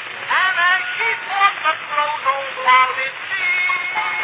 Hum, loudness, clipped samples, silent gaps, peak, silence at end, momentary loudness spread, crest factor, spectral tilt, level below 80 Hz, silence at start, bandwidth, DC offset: none; -17 LUFS; under 0.1%; none; -2 dBFS; 0 s; 6 LU; 18 dB; -3.5 dB/octave; -80 dBFS; 0 s; 4 kHz; under 0.1%